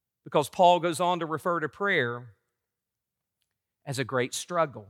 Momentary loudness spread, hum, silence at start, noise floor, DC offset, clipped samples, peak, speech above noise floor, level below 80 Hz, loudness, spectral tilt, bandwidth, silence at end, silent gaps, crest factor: 12 LU; none; 0.25 s; -87 dBFS; under 0.1%; under 0.1%; -10 dBFS; 60 dB; -78 dBFS; -27 LUFS; -4.5 dB/octave; 16.5 kHz; 0.05 s; none; 20 dB